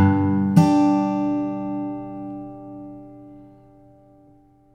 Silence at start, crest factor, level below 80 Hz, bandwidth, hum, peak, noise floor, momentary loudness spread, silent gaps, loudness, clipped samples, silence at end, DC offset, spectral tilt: 0 s; 20 dB; -60 dBFS; 10.5 kHz; none; -2 dBFS; -53 dBFS; 22 LU; none; -21 LUFS; under 0.1%; 1.3 s; under 0.1%; -8.5 dB/octave